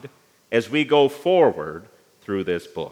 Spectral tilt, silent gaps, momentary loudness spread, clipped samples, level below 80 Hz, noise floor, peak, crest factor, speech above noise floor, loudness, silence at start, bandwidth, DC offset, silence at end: -6 dB/octave; none; 16 LU; under 0.1%; -66 dBFS; -45 dBFS; -4 dBFS; 18 dB; 25 dB; -21 LUFS; 0.05 s; 15.5 kHz; under 0.1%; 0.05 s